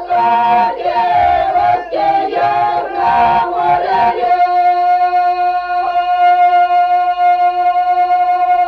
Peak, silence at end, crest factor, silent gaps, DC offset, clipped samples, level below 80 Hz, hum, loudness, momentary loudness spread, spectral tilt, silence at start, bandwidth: -4 dBFS; 0 s; 8 dB; none; under 0.1%; under 0.1%; -46 dBFS; none; -12 LUFS; 4 LU; -5.5 dB/octave; 0 s; 5.6 kHz